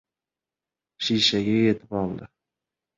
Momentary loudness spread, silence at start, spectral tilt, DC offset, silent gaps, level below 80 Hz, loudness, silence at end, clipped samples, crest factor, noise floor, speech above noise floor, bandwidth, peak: 11 LU; 1 s; -5 dB/octave; under 0.1%; none; -58 dBFS; -23 LUFS; 0.7 s; under 0.1%; 20 dB; -90 dBFS; 67 dB; 7.8 kHz; -6 dBFS